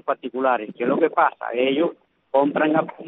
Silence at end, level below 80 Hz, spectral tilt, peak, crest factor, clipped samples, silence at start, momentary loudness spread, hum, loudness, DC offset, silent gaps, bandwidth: 0 s; -70 dBFS; -9.5 dB/octave; -4 dBFS; 16 dB; under 0.1%; 0.05 s; 5 LU; none; -21 LUFS; under 0.1%; none; 4 kHz